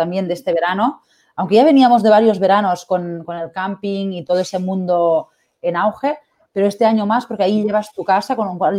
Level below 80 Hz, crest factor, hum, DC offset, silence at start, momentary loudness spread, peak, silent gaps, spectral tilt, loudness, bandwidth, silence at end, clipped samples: -64 dBFS; 14 dB; none; under 0.1%; 0 s; 13 LU; -2 dBFS; none; -6.5 dB/octave; -17 LUFS; 15 kHz; 0 s; under 0.1%